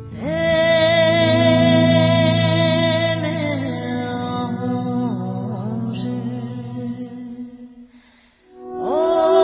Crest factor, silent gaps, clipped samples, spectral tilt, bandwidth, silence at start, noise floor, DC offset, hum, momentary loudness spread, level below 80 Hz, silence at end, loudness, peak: 16 dB; none; under 0.1%; -10.5 dB/octave; 4 kHz; 0 s; -53 dBFS; under 0.1%; none; 15 LU; -48 dBFS; 0 s; -18 LUFS; -2 dBFS